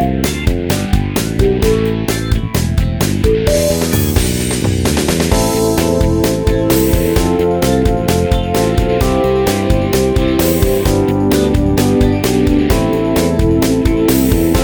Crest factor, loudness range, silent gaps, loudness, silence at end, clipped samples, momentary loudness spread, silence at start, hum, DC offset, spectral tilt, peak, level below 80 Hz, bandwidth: 12 dB; 2 LU; none; -13 LUFS; 0 s; under 0.1%; 3 LU; 0 s; none; under 0.1%; -5.5 dB/octave; 0 dBFS; -20 dBFS; over 20 kHz